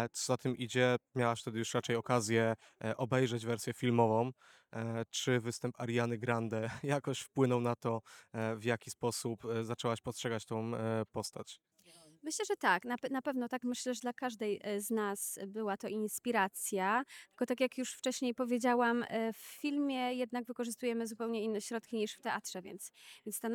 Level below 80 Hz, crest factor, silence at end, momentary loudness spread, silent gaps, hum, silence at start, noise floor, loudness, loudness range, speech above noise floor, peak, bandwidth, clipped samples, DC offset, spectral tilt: -80 dBFS; 22 dB; 0 s; 9 LU; none; none; 0 s; -63 dBFS; -36 LUFS; 4 LU; 27 dB; -14 dBFS; 19.5 kHz; under 0.1%; under 0.1%; -4.5 dB/octave